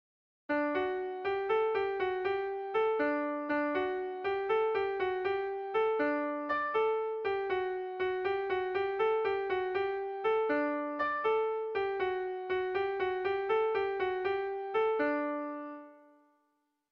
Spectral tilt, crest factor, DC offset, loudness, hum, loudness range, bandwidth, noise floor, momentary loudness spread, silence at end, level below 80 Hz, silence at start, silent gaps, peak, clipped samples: -6.5 dB/octave; 12 dB; under 0.1%; -33 LUFS; none; 1 LU; 5.6 kHz; -78 dBFS; 5 LU; 0.95 s; -70 dBFS; 0.5 s; none; -20 dBFS; under 0.1%